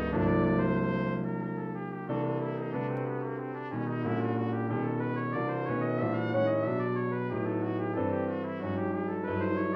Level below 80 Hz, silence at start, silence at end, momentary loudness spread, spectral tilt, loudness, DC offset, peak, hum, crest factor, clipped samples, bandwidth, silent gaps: -54 dBFS; 0 s; 0 s; 7 LU; -10.5 dB/octave; -31 LUFS; under 0.1%; -16 dBFS; none; 14 dB; under 0.1%; 5.6 kHz; none